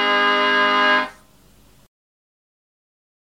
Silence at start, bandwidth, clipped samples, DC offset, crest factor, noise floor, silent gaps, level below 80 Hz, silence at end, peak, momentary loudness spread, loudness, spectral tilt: 0 s; 16.5 kHz; under 0.1%; 0.2%; 16 dB; -53 dBFS; none; -62 dBFS; 2.2 s; -6 dBFS; 5 LU; -16 LUFS; -2.5 dB/octave